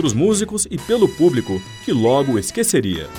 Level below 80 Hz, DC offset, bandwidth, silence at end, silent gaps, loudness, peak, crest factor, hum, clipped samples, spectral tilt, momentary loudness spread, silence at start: -44 dBFS; under 0.1%; 20 kHz; 0 s; none; -18 LUFS; -2 dBFS; 16 dB; none; under 0.1%; -5 dB/octave; 7 LU; 0 s